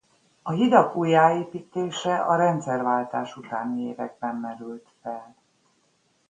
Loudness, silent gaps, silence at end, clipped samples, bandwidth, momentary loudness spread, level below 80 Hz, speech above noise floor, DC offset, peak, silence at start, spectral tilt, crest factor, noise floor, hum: -24 LUFS; none; 1.05 s; under 0.1%; 9.4 kHz; 18 LU; -72 dBFS; 43 dB; under 0.1%; -2 dBFS; 0.45 s; -6 dB/octave; 24 dB; -67 dBFS; none